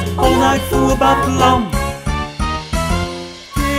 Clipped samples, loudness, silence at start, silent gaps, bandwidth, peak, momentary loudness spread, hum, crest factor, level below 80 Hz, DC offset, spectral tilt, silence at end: under 0.1%; -16 LUFS; 0 s; none; 16 kHz; 0 dBFS; 9 LU; none; 16 dB; -24 dBFS; under 0.1%; -5 dB/octave; 0 s